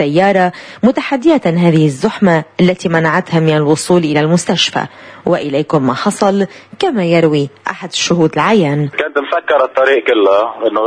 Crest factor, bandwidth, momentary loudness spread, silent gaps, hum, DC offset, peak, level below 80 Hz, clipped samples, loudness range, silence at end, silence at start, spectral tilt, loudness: 12 dB; 11 kHz; 6 LU; none; none; under 0.1%; 0 dBFS; -52 dBFS; under 0.1%; 2 LU; 0 s; 0 s; -5.5 dB/octave; -13 LUFS